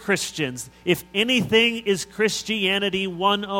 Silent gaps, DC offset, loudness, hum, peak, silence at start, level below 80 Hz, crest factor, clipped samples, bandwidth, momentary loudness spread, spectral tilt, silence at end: none; under 0.1%; -22 LUFS; none; -4 dBFS; 0 s; -56 dBFS; 20 dB; under 0.1%; 17 kHz; 8 LU; -3.5 dB/octave; 0 s